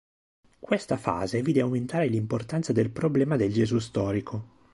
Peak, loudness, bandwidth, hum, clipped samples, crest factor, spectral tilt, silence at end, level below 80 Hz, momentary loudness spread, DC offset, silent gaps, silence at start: -8 dBFS; -27 LUFS; 11.5 kHz; none; under 0.1%; 18 dB; -7 dB/octave; 0.3 s; -54 dBFS; 5 LU; under 0.1%; none; 0.7 s